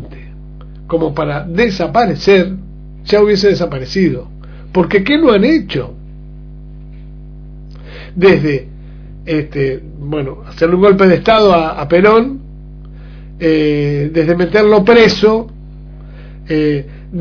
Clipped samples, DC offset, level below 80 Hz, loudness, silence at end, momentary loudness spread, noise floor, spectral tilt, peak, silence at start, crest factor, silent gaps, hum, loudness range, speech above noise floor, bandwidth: 0.2%; under 0.1%; -32 dBFS; -12 LUFS; 0 s; 18 LU; -31 dBFS; -7 dB/octave; 0 dBFS; 0 s; 14 dB; none; 50 Hz at -30 dBFS; 6 LU; 20 dB; 5.4 kHz